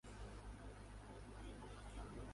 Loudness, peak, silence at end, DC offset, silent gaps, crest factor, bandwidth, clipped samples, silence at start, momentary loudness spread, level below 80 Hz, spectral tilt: -56 LUFS; -42 dBFS; 0 s; under 0.1%; none; 12 dB; 11.5 kHz; under 0.1%; 0.05 s; 3 LU; -56 dBFS; -5.5 dB/octave